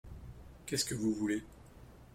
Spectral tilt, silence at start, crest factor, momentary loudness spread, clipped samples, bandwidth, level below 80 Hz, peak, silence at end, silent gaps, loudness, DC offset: -4 dB/octave; 0.05 s; 18 dB; 23 LU; under 0.1%; 16.5 kHz; -56 dBFS; -22 dBFS; 0 s; none; -35 LUFS; under 0.1%